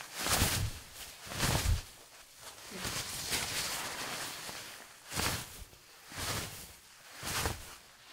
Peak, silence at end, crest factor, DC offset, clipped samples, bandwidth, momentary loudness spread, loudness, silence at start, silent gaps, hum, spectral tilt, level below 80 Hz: -14 dBFS; 0 s; 22 dB; under 0.1%; under 0.1%; 16 kHz; 19 LU; -35 LUFS; 0 s; none; none; -2.5 dB/octave; -48 dBFS